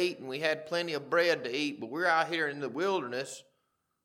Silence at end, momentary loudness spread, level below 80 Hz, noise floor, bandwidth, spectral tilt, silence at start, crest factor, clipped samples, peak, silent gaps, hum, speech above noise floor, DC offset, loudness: 0.65 s; 9 LU; -90 dBFS; -78 dBFS; 16 kHz; -4 dB/octave; 0 s; 18 dB; under 0.1%; -14 dBFS; none; none; 47 dB; under 0.1%; -31 LUFS